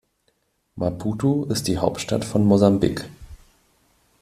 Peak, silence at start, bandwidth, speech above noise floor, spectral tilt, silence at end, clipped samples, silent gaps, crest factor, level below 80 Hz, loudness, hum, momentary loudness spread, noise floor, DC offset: -2 dBFS; 0.75 s; 14.5 kHz; 48 dB; -6.5 dB/octave; 0.85 s; under 0.1%; none; 20 dB; -48 dBFS; -21 LUFS; none; 11 LU; -68 dBFS; under 0.1%